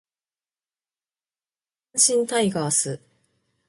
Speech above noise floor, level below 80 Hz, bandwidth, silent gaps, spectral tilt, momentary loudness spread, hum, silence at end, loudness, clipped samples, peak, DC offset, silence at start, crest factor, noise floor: over 68 dB; -68 dBFS; 12 kHz; none; -2.5 dB/octave; 11 LU; none; 0.7 s; -21 LUFS; under 0.1%; -4 dBFS; under 0.1%; 1.95 s; 24 dB; under -90 dBFS